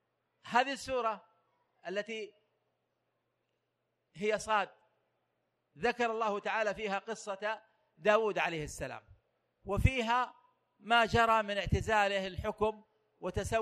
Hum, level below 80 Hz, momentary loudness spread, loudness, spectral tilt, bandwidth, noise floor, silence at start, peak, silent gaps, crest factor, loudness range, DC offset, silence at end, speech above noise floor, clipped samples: none; -50 dBFS; 14 LU; -33 LUFS; -5 dB/octave; 14.5 kHz; -83 dBFS; 0.45 s; -12 dBFS; none; 24 dB; 9 LU; under 0.1%; 0 s; 50 dB; under 0.1%